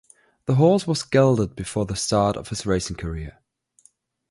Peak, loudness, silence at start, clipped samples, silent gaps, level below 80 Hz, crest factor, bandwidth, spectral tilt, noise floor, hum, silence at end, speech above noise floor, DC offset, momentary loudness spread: -6 dBFS; -22 LUFS; 0.5 s; under 0.1%; none; -44 dBFS; 18 dB; 11.5 kHz; -6 dB/octave; -60 dBFS; none; 1 s; 39 dB; under 0.1%; 14 LU